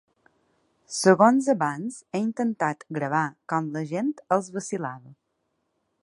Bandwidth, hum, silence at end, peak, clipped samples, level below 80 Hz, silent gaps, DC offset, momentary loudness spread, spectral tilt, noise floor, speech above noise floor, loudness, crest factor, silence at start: 11.5 kHz; none; 0.9 s; -4 dBFS; under 0.1%; -76 dBFS; none; under 0.1%; 14 LU; -5.5 dB/octave; -76 dBFS; 51 dB; -25 LUFS; 22 dB; 0.9 s